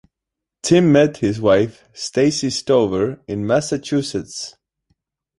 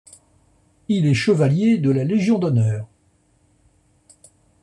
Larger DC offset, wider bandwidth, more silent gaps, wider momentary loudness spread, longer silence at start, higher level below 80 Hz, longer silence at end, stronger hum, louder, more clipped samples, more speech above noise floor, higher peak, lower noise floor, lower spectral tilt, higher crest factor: neither; about the same, 11.5 kHz vs 11 kHz; neither; about the same, 13 LU vs 11 LU; second, 0.65 s vs 0.9 s; first, -50 dBFS vs -58 dBFS; second, 0.9 s vs 1.75 s; neither; about the same, -18 LUFS vs -19 LUFS; neither; first, 66 dB vs 43 dB; first, -2 dBFS vs -6 dBFS; first, -84 dBFS vs -61 dBFS; second, -5.5 dB/octave vs -7.5 dB/octave; about the same, 18 dB vs 14 dB